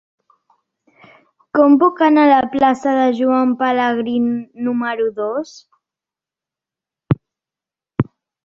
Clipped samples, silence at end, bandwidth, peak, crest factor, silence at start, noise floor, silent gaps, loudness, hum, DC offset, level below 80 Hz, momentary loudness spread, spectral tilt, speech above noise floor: under 0.1%; 0.4 s; 7.4 kHz; -2 dBFS; 16 dB; 1.55 s; -89 dBFS; none; -16 LUFS; none; under 0.1%; -52 dBFS; 11 LU; -7.5 dB/octave; 74 dB